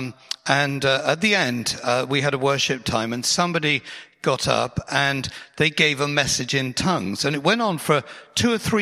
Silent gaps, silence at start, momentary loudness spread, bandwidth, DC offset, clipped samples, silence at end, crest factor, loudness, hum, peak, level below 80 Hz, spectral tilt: none; 0 s; 6 LU; 15.5 kHz; under 0.1%; under 0.1%; 0 s; 22 dB; -21 LUFS; none; 0 dBFS; -50 dBFS; -3.5 dB/octave